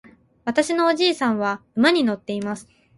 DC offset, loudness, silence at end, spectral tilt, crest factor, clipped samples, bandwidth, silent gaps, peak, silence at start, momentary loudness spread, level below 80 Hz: under 0.1%; -21 LUFS; 0.35 s; -4 dB/octave; 18 dB; under 0.1%; 11.5 kHz; none; -4 dBFS; 0.45 s; 12 LU; -64 dBFS